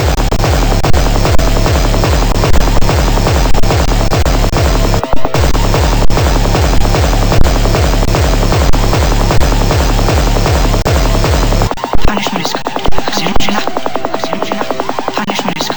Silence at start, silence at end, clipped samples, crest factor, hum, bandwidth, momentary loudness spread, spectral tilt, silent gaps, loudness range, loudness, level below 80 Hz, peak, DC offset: 0 s; 0 s; 3%; 8 dB; none; over 20 kHz; 5 LU; -5 dB/octave; none; 3 LU; -13 LUFS; -12 dBFS; 0 dBFS; under 0.1%